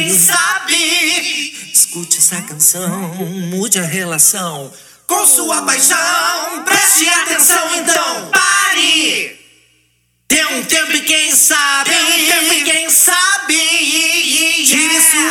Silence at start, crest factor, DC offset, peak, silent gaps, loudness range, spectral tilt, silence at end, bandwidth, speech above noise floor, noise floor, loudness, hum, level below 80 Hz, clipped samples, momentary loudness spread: 0 s; 14 dB; under 0.1%; 0 dBFS; none; 4 LU; -0.5 dB/octave; 0 s; over 20 kHz; 46 dB; -59 dBFS; -10 LUFS; none; -64 dBFS; under 0.1%; 10 LU